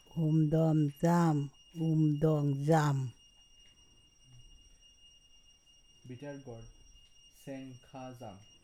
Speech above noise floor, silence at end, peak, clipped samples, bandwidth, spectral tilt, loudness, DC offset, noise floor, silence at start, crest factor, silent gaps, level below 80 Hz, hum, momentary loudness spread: 32 dB; 0.25 s; -16 dBFS; under 0.1%; 13 kHz; -8 dB/octave; -30 LUFS; under 0.1%; -63 dBFS; 0.15 s; 18 dB; none; -62 dBFS; none; 21 LU